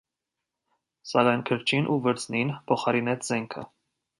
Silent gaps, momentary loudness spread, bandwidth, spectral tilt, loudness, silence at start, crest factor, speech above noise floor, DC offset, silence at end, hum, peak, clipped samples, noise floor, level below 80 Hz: none; 9 LU; 11.5 kHz; -5 dB/octave; -26 LUFS; 1.05 s; 20 dB; 60 dB; under 0.1%; 0.55 s; none; -8 dBFS; under 0.1%; -86 dBFS; -70 dBFS